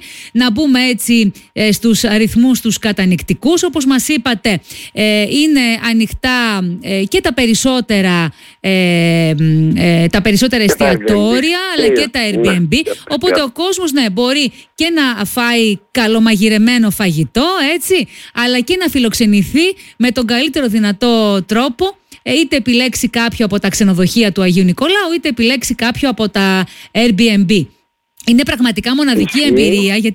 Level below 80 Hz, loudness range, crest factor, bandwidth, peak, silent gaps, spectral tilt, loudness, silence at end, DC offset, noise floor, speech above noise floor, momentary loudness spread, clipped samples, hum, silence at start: -40 dBFS; 2 LU; 10 dB; 17 kHz; -2 dBFS; none; -4.5 dB/octave; -12 LUFS; 0 s; under 0.1%; -43 dBFS; 31 dB; 5 LU; under 0.1%; none; 0 s